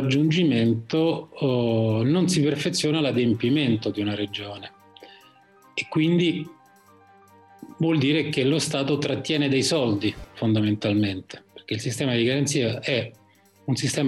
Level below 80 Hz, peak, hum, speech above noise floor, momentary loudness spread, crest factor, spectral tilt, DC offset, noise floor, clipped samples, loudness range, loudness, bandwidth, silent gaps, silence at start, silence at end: -60 dBFS; -12 dBFS; none; 32 dB; 11 LU; 12 dB; -5.5 dB/octave; under 0.1%; -55 dBFS; under 0.1%; 5 LU; -23 LUFS; 12.5 kHz; none; 0 s; 0 s